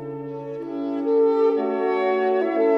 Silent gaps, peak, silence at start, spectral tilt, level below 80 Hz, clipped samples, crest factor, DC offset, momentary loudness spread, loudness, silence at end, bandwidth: none; -8 dBFS; 0 s; -8 dB/octave; -68 dBFS; under 0.1%; 14 dB; under 0.1%; 13 LU; -22 LUFS; 0 s; 5.6 kHz